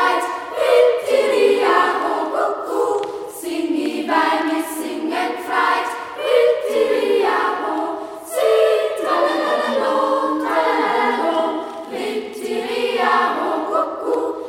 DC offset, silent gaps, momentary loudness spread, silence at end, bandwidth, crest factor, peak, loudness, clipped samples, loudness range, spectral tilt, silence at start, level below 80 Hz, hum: under 0.1%; none; 10 LU; 0 s; 16.5 kHz; 16 dB; -2 dBFS; -19 LUFS; under 0.1%; 3 LU; -2.5 dB/octave; 0 s; -64 dBFS; none